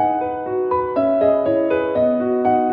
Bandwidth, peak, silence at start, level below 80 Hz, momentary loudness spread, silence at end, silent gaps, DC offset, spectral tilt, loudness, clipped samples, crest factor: 4.9 kHz; -6 dBFS; 0 s; -52 dBFS; 5 LU; 0 s; none; under 0.1%; -10 dB/octave; -18 LUFS; under 0.1%; 12 dB